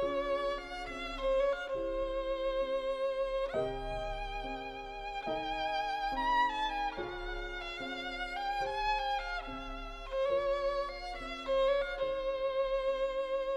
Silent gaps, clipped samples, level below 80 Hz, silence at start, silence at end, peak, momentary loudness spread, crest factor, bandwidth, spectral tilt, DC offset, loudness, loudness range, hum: none; under 0.1%; -48 dBFS; 0 s; 0 s; -20 dBFS; 9 LU; 14 dB; 10 kHz; -4.5 dB/octave; under 0.1%; -35 LUFS; 3 LU; none